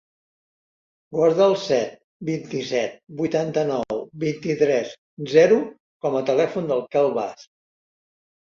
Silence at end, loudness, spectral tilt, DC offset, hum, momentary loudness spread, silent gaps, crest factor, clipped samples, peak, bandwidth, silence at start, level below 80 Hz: 1 s; -22 LUFS; -6 dB/octave; under 0.1%; none; 13 LU; 2.04-2.20 s, 4.98-5.17 s, 5.80-6.00 s; 20 dB; under 0.1%; -4 dBFS; 7.4 kHz; 1.1 s; -66 dBFS